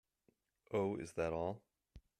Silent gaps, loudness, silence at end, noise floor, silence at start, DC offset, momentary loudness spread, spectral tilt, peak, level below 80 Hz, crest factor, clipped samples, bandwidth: none; -41 LUFS; 0.2 s; -79 dBFS; 0.7 s; under 0.1%; 5 LU; -7 dB/octave; -26 dBFS; -68 dBFS; 18 dB; under 0.1%; 13.5 kHz